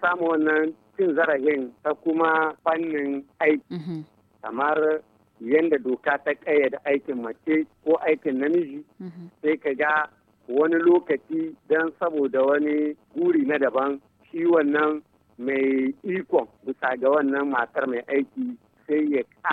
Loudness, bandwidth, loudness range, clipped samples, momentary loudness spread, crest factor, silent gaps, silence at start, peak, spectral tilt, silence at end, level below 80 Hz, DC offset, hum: -24 LUFS; 4.6 kHz; 2 LU; under 0.1%; 12 LU; 16 dB; none; 0 s; -8 dBFS; -8 dB/octave; 0 s; -74 dBFS; under 0.1%; none